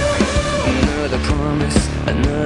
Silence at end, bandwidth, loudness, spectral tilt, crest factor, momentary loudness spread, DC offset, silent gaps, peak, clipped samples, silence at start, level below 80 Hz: 0 s; 11 kHz; -18 LUFS; -5.5 dB/octave; 16 dB; 2 LU; under 0.1%; none; -2 dBFS; under 0.1%; 0 s; -24 dBFS